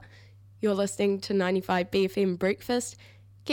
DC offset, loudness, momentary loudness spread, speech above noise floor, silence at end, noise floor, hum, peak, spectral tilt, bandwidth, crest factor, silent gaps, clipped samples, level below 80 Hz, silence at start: under 0.1%; -28 LUFS; 5 LU; 25 dB; 0 s; -52 dBFS; none; -12 dBFS; -5 dB/octave; 18 kHz; 18 dB; none; under 0.1%; -62 dBFS; 0 s